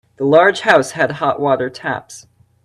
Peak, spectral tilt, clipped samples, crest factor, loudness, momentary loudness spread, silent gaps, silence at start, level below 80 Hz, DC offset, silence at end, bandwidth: 0 dBFS; -4.5 dB/octave; under 0.1%; 16 dB; -15 LUFS; 12 LU; none; 0.2 s; -58 dBFS; under 0.1%; 0.45 s; 13 kHz